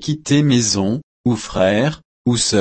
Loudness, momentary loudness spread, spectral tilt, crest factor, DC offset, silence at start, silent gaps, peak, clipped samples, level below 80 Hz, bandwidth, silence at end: -17 LUFS; 7 LU; -4.5 dB/octave; 14 dB; under 0.1%; 0 s; 1.03-1.24 s, 2.05-2.25 s; -2 dBFS; under 0.1%; -44 dBFS; 8.8 kHz; 0 s